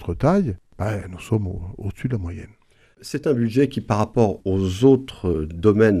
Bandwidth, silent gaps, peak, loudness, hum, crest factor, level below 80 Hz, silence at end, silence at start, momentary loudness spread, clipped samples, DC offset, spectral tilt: 13.5 kHz; none; -2 dBFS; -21 LUFS; none; 18 dB; -42 dBFS; 0 s; 0 s; 14 LU; under 0.1%; under 0.1%; -8 dB/octave